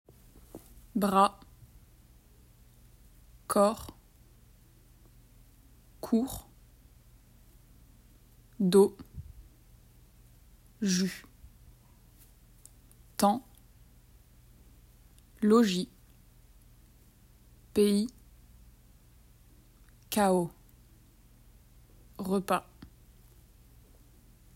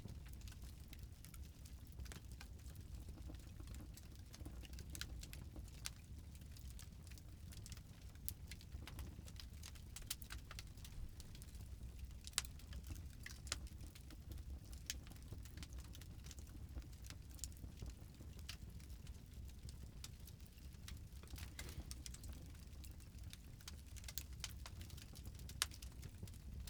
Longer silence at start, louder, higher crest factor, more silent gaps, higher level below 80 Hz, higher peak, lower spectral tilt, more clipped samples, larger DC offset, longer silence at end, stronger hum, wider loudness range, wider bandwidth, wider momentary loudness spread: first, 0.55 s vs 0 s; first, -29 LUFS vs -53 LUFS; second, 24 dB vs 38 dB; neither; about the same, -58 dBFS vs -56 dBFS; first, -10 dBFS vs -14 dBFS; first, -5.5 dB/octave vs -3 dB/octave; neither; neither; first, 1.95 s vs 0 s; neither; about the same, 7 LU vs 5 LU; second, 16 kHz vs over 20 kHz; first, 25 LU vs 8 LU